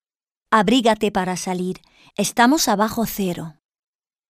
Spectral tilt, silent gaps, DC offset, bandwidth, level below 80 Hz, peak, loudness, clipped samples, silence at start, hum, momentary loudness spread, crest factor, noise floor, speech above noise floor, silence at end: -4 dB/octave; none; under 0.1%; 15.5 kHz; -50 dBFS; -2 dBFS; -19 LUFS; under 0.1%; 0.5 s; none; 15 LU; 18 dB; -85 dBFS; 66 dB; 0.8 s